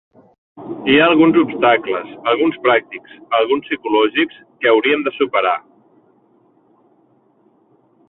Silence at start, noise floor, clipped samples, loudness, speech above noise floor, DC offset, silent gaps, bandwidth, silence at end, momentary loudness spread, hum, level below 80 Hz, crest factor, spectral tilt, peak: 0.55 s; -56 dBFS; under 0.1%; -16 LUFS; 41 dB; under 0.1%; none; 4.1 kHz; 2.5 s; 12 LU; none; -60 dBFS; 16 dB; -9.5 dB/octave; -2 dBFS